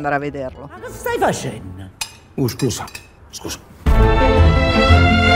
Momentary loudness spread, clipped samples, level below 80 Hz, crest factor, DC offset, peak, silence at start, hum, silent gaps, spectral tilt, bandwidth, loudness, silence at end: 20 LU; under 0.1%; -22 dBFS; 16 dB; under 0.1%; 0 dBFS; 0 s; none; none; -5.5 dB/octave; 16 kHz; -17 LUFS; 0 s